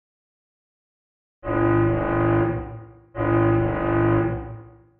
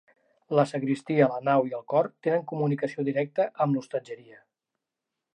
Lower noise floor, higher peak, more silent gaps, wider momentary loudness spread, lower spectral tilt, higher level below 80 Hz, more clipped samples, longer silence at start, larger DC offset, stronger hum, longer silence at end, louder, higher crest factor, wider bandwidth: second, -41 dBFS vs -86 dBFS; about the same, -8 dBFS vs -8 dBFS; neither; first, 18 LU vs 7 LU; about the same, -8.5 dB/octave vs -8 dB/octave; first, -40 dBFS vs -82 dBFS; neither; first, 1.45 s vs 0.5 s; neither; neither; second, 0.3 s vs 1.2 s; first, -22 LUFS vs -27 LUFS; about the same, 16 dB vs 20 dB; second, 3.5 kHz vs 10 kHz